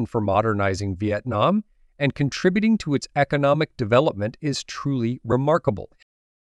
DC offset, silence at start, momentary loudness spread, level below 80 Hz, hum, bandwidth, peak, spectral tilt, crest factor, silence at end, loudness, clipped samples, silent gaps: under 0.1%; 0 s; 7 LU; -52 dBFS; none; 11 kHz; -4 dBFS; -6.5 dB/octave; 18 dB; 0.6 s; -22 LUFS; under 0.1%; none